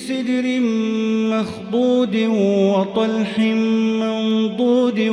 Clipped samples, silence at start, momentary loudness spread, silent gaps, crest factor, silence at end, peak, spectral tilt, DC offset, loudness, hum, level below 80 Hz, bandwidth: under 0.1%; 0 s; 3 LU; none; 12 dB; 0 s; -6 dBFS; -6.5 dB/octave; under 0.1%; -18 LUFS; none; -62 dBFS; 11 kHz